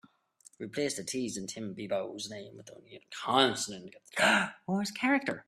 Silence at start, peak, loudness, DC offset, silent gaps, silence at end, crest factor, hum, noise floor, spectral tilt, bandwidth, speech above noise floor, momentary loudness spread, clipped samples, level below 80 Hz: 0.6 s; -10 dBFS; -31 LUFS; under 0.1%; none; 0.05 s; 24 dB; none; -62 dBFS; -3 dB/octave; 14 kHz; 29 dB; 20 LU; under 0.1%; -74 dBFS